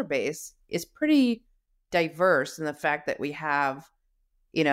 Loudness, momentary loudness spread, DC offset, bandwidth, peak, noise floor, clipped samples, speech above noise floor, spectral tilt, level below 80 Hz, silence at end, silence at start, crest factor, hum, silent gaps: -27 LUFS; 11 LU; under 0.1%; 16 kHz; -12 dBFS; -70 dBFS; under 0.1%; 43 dB; -5 dB/octave; -66 dBFS; 0 s; 0 s; 16 dB; none; none